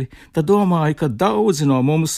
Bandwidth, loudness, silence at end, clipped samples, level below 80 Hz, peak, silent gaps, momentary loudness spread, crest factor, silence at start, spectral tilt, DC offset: 15.5 kHz; -17 LUFS; 0 s; under 0.1%; -50 dBFS; -4 dBFS; none; 5 LU; 12 dB; 0 s; -6.5 dB/octave; under 0.1%